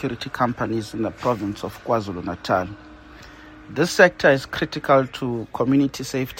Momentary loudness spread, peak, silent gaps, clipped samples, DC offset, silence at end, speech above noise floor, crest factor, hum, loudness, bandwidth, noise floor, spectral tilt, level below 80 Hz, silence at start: 13 LU; 0 dBFS; none; under 0.1%; under 0.1%; 0 s; 21 dB; 22 dB; none; -22 LUFS; 16.5 kHz; -43 dBFS; -5.5 dB/octave; -50 dBFS; 0 s